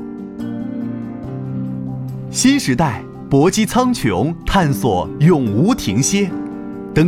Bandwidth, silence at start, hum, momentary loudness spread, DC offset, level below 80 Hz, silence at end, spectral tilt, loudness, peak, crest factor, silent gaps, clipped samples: 16.5 kHz; 0 s; none; 13 LU; under 0.1%; -36 dBFS; 0 s; -5.5 dB/octave; -17 LUFS; -2 dBFS; 16 dB; none; under 0.1%